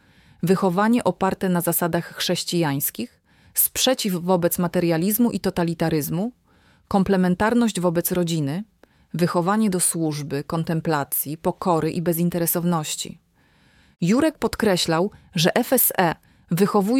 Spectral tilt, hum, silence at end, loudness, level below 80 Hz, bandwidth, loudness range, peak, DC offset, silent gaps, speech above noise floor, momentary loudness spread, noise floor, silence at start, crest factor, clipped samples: -4.5 dB/octave; none; 0 s; -22 LUFS; -52 dBFS; 18 kHz; 2 LU; -4 dBFS; under 0.1%; none; 38 dB; 8 LU; -59 dBFS; 0.45 s; 18 dB; under 0.1%